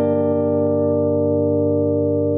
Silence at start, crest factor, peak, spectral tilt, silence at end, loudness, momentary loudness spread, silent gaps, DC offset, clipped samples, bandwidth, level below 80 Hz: 0 s; 10 dB; -6 dBFS; -12.5 dB/octave; 0 s; -18 LUFS; 0 LU; none; under 0.1%; under 0.1%; 3.3 kHz; -64 dBFS